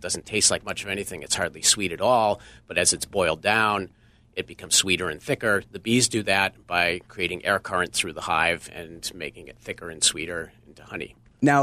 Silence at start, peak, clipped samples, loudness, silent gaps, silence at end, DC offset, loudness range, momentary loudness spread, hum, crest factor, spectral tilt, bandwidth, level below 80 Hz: 0 s; -6 dBFS; under 0.1%; -23 LUFS; none; 0 s; under 0.1%; 4 LU; 16 LU; none; 20 dB; -2 dB/octave; 15.5 kHz; -54 dBFS